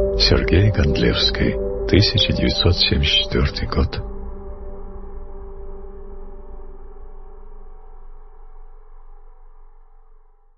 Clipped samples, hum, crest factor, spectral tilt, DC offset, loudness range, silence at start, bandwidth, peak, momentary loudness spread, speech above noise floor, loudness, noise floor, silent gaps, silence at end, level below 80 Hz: under 0.1%; none; 20 dB; -6 dB/octave; under 0.1%; 24 LU; 0 s; 6.2 kHz; -2 dBFS; 23 LU; 31 dB; -17 LUFS; -48 dBFS; none; 0.45 s; -28 dBFS